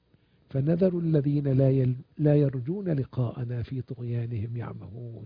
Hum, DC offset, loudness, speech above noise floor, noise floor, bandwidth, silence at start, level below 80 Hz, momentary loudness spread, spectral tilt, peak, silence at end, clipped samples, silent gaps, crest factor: none; under 0.1%; -27 LUFS; 37 dB; -63 dBFS; 5 kHz; 0.5 s; -56 dBFS; 12 LU; -12.5 dB/octave; -10 dBFS; 0 s; under 0.1%; none; 16 dB